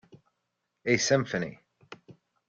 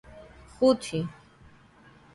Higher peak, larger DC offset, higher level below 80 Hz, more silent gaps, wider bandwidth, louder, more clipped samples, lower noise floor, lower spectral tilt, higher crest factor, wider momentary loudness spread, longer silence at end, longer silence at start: about the same, -10 dBFS vs -10 dBFS; neither; second, -68 dBFS vs -58 dBFS; neither; second, 10 kHz vs 11.5 kHz; about the same, -28 LUFS vs -27 LUFS; neither; first, -81 dBFS vs -55 dBFS; second, -4 dB/octave vs -6 dB/octave; about the same, 22 dB vs 20 dB; about the same, 24 LU vs 26 LU; second, 0.35 s vs 1.05 s; about the same, 0.15 s vs 0.1 s